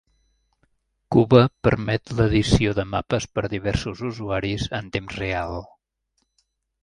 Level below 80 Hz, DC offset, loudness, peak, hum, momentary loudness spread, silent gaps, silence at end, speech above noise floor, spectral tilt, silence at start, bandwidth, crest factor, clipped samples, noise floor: -40 dBFS; under 0.1%; -22 LUFS; 0 dBFS; none; 12 LU; none; 1.2 s; 52 dB; -6.5 dB/octave; 1.1 s; 11 kHz; 22 dB; under 0.1%; -73 dBFS